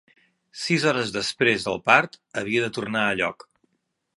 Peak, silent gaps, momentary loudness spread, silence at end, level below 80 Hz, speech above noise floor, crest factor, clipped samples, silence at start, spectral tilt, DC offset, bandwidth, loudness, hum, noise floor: 0 dBFS; none; 12 LU; 0.85 s; -62 dBFS; 52 dB; 24 dB; under 0.1%; 0.55 s; -4 dB/octave; under 0.1%; 11.5 kHz; -23 LUFS; none; -75 dBFS